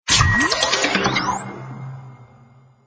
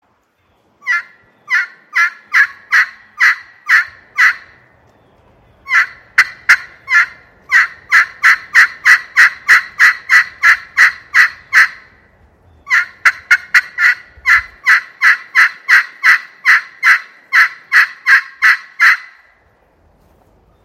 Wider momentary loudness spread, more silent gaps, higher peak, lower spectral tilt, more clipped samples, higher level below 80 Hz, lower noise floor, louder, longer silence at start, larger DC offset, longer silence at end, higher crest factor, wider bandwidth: first, 20 LU vs 6 LU; neither; about the same, 0 dBFS vs 0 dBFS; first, -2.5 dB/octave vs 2 dB/octave; second, under 0.1% vs 0.5%; first, -36 dBFS vs -56 dBFS; second, -50 dBFS vs -58 dBFS; second, -17 LUFS vs -11 LUFS; second, 0.05 s vs 0.85 s; neither; second, 0.65 s vs 1.65 s; first, 20 dB vs 14 dB; second, 8 kHz vs over 20 kHz